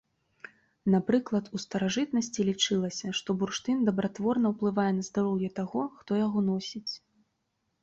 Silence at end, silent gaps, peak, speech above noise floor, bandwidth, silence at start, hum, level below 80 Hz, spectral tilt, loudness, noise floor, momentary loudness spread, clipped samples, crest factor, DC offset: 0.85 s; none; -12 dBFS; 50 dB; 7.8 kHz; 0.85 s; none; -66 dBFS; -5 dB/octave; -29 LUFS; -79 dBFS; 8 LU; under 0.1%; 18 dB; under 0.1%